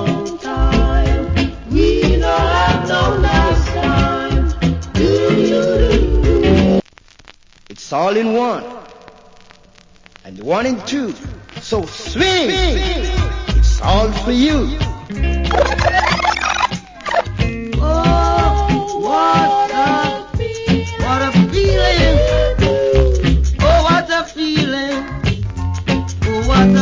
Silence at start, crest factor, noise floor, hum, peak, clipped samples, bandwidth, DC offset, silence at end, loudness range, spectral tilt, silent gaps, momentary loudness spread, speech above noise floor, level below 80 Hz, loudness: 0 s; 14 dB; -46 dBFS; none; 0 dBFS; under 0.1%; 7.6 kHz; under 0.1%; 0 s; 6 LU; -6 dB/octave; none; 8 LU; 30 dB; -20 dBFS; -15 LUFS